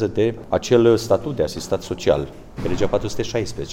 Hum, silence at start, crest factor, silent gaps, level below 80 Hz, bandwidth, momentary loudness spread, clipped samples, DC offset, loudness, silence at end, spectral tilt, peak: none; 0 s; 18 dB; none; -40 dBFS; 16.5 kHz; 10 LU; under 0.1%; under 0.1%; -21 LUFS; 0 s; -6 dB/octave; -2 dBFS